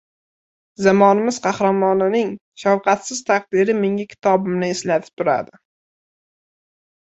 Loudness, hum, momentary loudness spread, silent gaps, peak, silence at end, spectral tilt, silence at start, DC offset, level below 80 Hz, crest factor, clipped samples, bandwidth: -18 LUFS; none; 8 LU; 2.41-2.52 s, 5.13-5.17 s; -2 dBFS; 1.65 s; -5.5 dB/octave; 0.8 s; under 0.1%; -64 dBFS; 18 dB; under 0.1%; 8.2 kHz